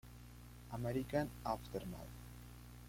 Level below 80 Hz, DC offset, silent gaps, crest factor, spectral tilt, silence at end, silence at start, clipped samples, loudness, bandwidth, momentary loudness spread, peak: -58 dBFS; under 0.1%; none; 20 dB; -6.5 dB/octave; 0 s; 0.05 s; under 0.1%; -43 LUFS; 16.5 kHz; 18 LU; -24 dBFS